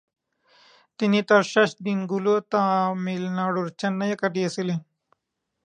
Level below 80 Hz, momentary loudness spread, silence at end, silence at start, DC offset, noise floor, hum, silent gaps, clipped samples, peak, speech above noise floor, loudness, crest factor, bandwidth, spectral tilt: -76 dBFS; 9 LU; 0.85 s; 1 s; under 0.1%; -80 dBFS; none; none; under 0.1%; -4 dBFS; 57 dB; -24 LUFS; 20 dB; 10 kHz; -6 dB/octave